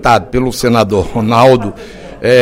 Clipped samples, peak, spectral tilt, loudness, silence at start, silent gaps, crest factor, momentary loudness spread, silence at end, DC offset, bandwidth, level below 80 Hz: 0.5%; 0 dBFS; -6 dB/octave; -11 LUFS; 0 s; none; 10 dB; 15 LU; 0 s; under 0.1%; 16.5 kHz; -32 dBFS